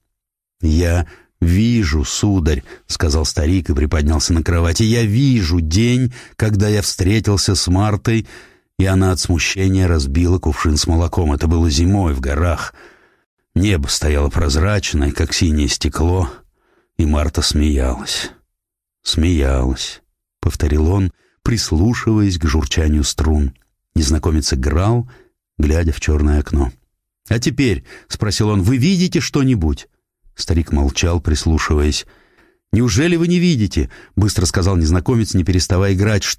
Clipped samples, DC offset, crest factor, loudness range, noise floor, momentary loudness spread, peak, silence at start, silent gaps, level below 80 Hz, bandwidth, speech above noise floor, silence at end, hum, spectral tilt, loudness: under 0.1%; under 0.1%; 12 dB; 3 LU; -81 dBFS; 7 LU; -4 dBFS; 0.6 s; 13.26-13.37 s; -22 dBFS; 15 kHz; 66 dB; 0.05 s; none; -5.5 dB/octave; -17 LUFS